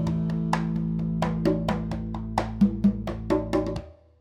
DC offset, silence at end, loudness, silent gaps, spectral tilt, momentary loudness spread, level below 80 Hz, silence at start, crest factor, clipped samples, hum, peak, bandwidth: under 0.1%; 0.3 s; -27 LUFS; none; -8 dB/octave; 8 LU; -40 dBFS; 0 s; 20 dB; under 0.1%; none; -6 dBFS; 10.5 kHz